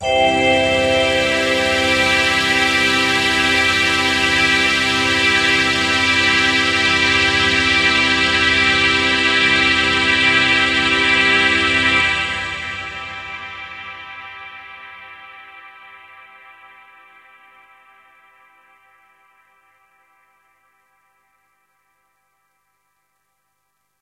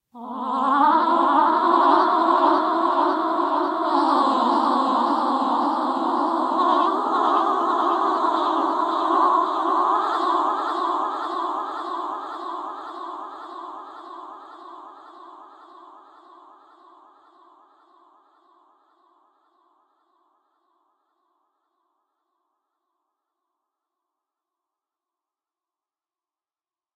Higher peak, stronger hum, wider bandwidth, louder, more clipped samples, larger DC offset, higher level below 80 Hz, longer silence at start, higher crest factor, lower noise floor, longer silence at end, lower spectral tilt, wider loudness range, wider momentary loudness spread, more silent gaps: first, 0 dBFS vs -4 dBFS; first, 50 Hz at -50 dBFS vs none; first, 16 kHz vs 9.4 kHz; first, -14 LUFS vs -21 LUFS; neither; neither; first, -42 dBFS vs -80 dBFS; second, 0 s vs 0.15 s; about the same, 18 dB vs 20 dB; second, -70 dBFS vs under -90 dBFS; second, 8.05 s vs 11.05 s; second, -2.5 dB/octave vs -4 dB/octave; about the same, 16 LU vs 18 LU; about the same, 17 LU vs 18 LU; neither